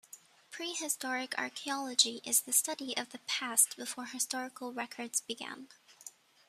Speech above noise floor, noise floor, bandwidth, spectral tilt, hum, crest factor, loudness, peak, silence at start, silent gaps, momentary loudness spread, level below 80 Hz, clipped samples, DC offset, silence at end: 22 dB; -57 dBFS; 15 kHz; 1 dB/octave; none; 26 dB; -32 LUFS; -10 dBFS; 0.15 s; none; 18 LU; -88 dBFS; under 0.1%; under 0.1%; 0.4 s